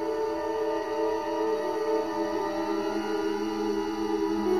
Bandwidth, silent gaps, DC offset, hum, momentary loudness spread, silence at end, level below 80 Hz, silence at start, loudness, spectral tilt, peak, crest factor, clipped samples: 15.5 kHz; none; 0.3%; none; 2 LU; 0 s; -58 dBFS; 0 s; -29 LUFS; -5 dB/octave; -16 dBFS; 12 dB; under 0.1%